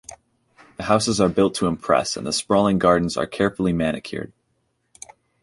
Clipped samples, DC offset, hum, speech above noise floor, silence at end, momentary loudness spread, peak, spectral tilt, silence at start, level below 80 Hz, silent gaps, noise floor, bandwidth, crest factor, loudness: under 0.1%; under 0.1%; none; 50 dB; 1.15 s; 14 LU; -2 dBFS; -5 dB/octave; 0.1 s; -48 dBFS; none; -70 dBFS; 11.5 kHz; 20 dB; -20 LUFS